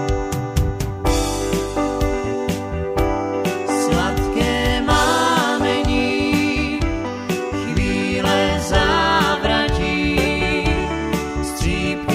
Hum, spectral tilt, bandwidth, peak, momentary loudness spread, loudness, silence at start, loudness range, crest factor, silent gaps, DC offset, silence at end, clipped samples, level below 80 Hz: none; -5 dB/octave; 16 kHz; -2 dBFS; 7 LU; -19 LUFS; 0 s; 3 LU; 16 dB; none; under 0.1%; 0 s; under 0.1%; -28 dBFS